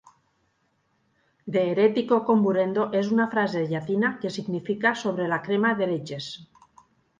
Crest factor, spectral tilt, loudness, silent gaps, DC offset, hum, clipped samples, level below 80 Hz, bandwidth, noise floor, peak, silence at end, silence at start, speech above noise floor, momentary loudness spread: 18 dB; -6.5 dB/octave; -24 LUFS; none; under 0.1%; none; under 0.1%; -70 dBFS; 9 kHz; -70 dBFS; -8 dBFS; 0.75 s; 1.45 s; 46 dB; 10 LU